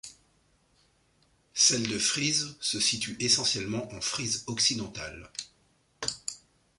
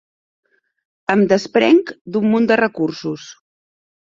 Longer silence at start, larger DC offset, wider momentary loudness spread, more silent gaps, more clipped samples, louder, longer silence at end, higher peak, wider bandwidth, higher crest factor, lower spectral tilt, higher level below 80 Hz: second, 0.05 s vs 1.1 s; neither; first, 17 LU vs 14 LU; second, none vs 2.01-2.05 s; neither; second, -27 LUFS vs -17 LUFS; second, 0.4 s vs 0.8 s; second, -10 dBFS vs -2 dBFS; first, 11.5 kHz vs 7.6 kHz; about the same, 22 dB vs 18 dB; second, -1.5 dB/octave vs -6 dB/octave; about the same, -62 dBFS vs -60 dBFS